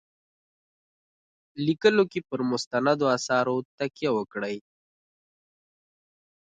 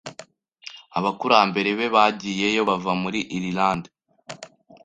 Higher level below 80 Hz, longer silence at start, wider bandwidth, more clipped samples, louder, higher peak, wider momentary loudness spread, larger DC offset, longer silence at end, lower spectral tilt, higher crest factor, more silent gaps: second, -72 dBFS vs -60 dBFS; first, 1.55 s vs 0.05 s; about the same, 9.2 kHz vs 9.4 kHz; neither; second, -26 LUFS vs -22 LUFS; second, -6 dBFS vs -2 dBFS; second, 12 LU vs 22 LU; neither; first, 2 s vs 0.4 s; about the same, -5 dB/octave vs -4.5 dB/octave; about the same, 22 dB vs 22 dB; first, 2.67-2.71 s, 3.65-3.78 s vs none